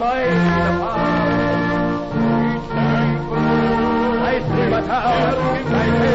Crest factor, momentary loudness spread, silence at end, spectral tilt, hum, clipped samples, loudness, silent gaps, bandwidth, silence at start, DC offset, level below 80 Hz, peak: 10 dB; 3 LU; 0 s; -8 dB/octave; none; under 0.1%; -18 LUFS; none; 7.8 kHz; 0 s; 0.2%; -36 dBFS; -8 dBFS